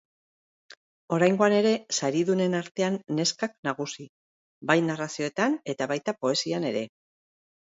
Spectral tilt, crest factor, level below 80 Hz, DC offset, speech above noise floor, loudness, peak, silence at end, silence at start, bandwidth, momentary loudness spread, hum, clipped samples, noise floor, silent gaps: -4.5 dB/octave; 22 dB; -74 dBFS; under 0.1%; over 64 dB; -26 LUFS; -6 dBFS; 0.85 s; 1.1 s; 8 kHz; 10 LU; none; under 0.1%; under -90 dBFS; 2.71-2.75 s, 3.58-3.63 s, 4.09-4.61 s